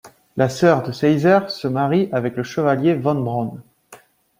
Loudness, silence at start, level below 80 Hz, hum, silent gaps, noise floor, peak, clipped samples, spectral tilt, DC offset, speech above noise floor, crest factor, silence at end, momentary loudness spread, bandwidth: -19 LUFS; 0.05 s; -58 dBFS; none; none; -48 dBFS; -2 dBFS; under 0.1%; -7 dB/octave; under 0.1%; 30 dB; 18 dB; 0.45 s; 8 LU; 16 kHz